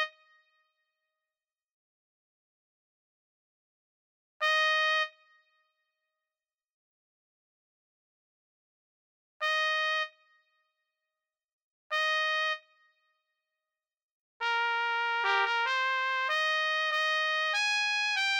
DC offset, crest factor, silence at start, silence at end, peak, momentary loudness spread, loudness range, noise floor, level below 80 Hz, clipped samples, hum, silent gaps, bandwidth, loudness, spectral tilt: under 0.1%; 20 dB; 0 s; 0 s; -14 dBFS; 7 LU; 7 LU; under -90 dBFS; under -90 dBFS; under 0.1%; none; 1.72-4.40 s, 6.74-9.40 s, 11.53-11.90 s, 14.03-14.40 s; 17.5 kHz; -28 LUFS; 3.5 dB/octave